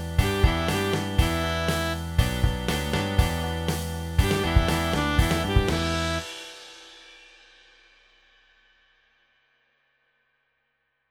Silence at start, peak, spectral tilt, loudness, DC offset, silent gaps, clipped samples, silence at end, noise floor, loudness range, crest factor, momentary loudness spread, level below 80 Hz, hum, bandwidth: 0 s; -6 dBFS; -5 dB/octave; -25 LUFS; under 0.1%; none; under 0.1%; 3.95 s; -74 dBFS; 9 LU; 20 dB; 13 LU; -32 dBFS; none; 19.5 kHz